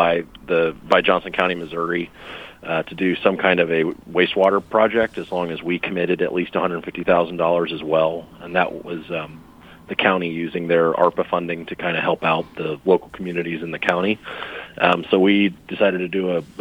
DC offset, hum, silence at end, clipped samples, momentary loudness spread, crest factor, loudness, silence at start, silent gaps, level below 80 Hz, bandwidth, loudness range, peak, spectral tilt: under 0.1%; none; 0 s; under 0.1%; 11 LU; 20 dB; -20 LUFS; 0 s; none; -54 dBFS; 15 kHz; 3 LU; 0 dBFS; -7 dB/octave